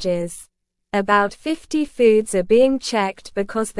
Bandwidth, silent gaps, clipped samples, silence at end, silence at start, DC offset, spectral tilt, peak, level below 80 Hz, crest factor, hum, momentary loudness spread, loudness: 12 kHz; none; under 0.1%; 0 s; 0 s; under 0.1%; -4.5 dB/octave; -4 dBFS; -50 dBFS; 16 dB; none; 11 LU; -19 LUFS